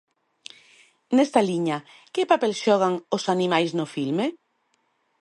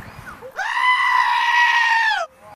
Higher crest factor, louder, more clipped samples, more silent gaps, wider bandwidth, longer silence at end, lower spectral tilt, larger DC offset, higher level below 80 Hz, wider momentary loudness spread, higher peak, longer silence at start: first, 20 dB vs 14 dB; second, -23 LUFS vs -16 LUFS; neither; neither; second, 11.5 kHz vs 15 kHz; first, 0.85 s vs 0 s; first, -5.5 dB/octave vs 0 dB/octave; neither; second, -76 dBFS vs -56 dBFS; second, 11 LU vs 18 LU; about the same, -4 dBFS vs -6 dBFS; first, 1.1 s vs 0 s